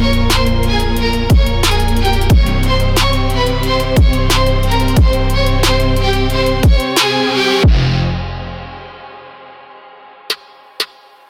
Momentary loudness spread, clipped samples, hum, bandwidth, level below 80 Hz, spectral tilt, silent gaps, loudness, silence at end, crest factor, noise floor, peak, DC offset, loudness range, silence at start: 11 LU; under 0.1%; none; 16.5 kHz; -16 dBFS; -5 dB/octave; none; -14 LUFS; 0.45 s; 12 dB; -38 dBFS; -2 dBFS; under 0.1%; 5 LU; 0 s